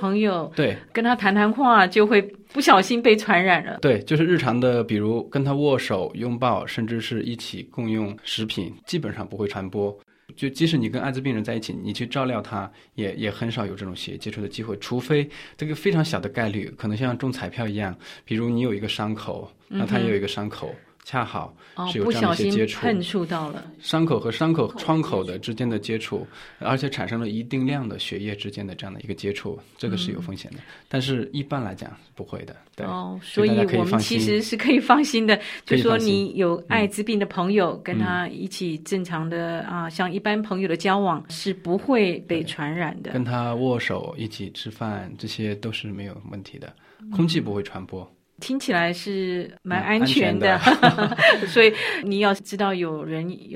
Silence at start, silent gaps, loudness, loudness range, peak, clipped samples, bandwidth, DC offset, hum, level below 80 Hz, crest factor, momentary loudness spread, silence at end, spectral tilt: 0 s; none; -23 LUFS; 10 LU; 0 dBFS; under 0.1%; 15.5 kHz; under 0.1%; none; -60 dBFS; 22 dB; 15 LU; 0 s; -5.5 dB/octave